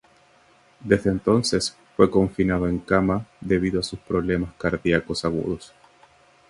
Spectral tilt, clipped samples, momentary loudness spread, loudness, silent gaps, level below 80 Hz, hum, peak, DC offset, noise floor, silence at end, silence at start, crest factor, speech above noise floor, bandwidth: -5.5 dB/octave; under 0.1%; 8 LU; -23 LUFS; none; -44 dBFS; none; -2 dBFS; under 0.1%; -57 dBFS; 0.85 s; 0.8 s; 22 dB; 34 dB; 11.5 kHz